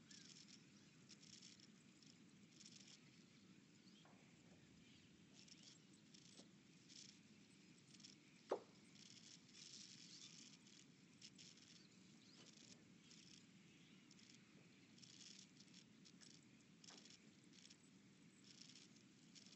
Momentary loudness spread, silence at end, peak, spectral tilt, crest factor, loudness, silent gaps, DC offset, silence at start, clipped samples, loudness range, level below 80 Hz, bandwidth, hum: 9 LU; 0 s; -32 dBFS; -3 dB/octave; 32 dB; -63 LUFS; none; under 0.1%; 0 s; under 0.1%; 8 LU; under -90 dBFS; 8.2 kHz; none